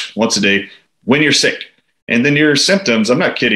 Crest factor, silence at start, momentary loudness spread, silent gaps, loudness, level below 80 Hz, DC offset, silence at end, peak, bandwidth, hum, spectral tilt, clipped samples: 14 dB; 0 s; 17 LU; 2.02-2.07 s; -12 LUFS; -58 dBFS; under 0.1%; 0 s; 0 dBFS; 15 kHz; none; -3.5 dB/octave; under 0.1%